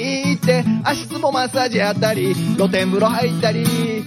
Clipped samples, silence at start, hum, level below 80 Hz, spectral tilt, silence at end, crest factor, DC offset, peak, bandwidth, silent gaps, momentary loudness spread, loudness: under 0.1%; 0 s; none; -56 dBFS; -5.5 dB/octave; 0 s; 14 dB; under 0.1%; -4 dBFS; 16.5 kHz; none; 3 LU; -18 LUFS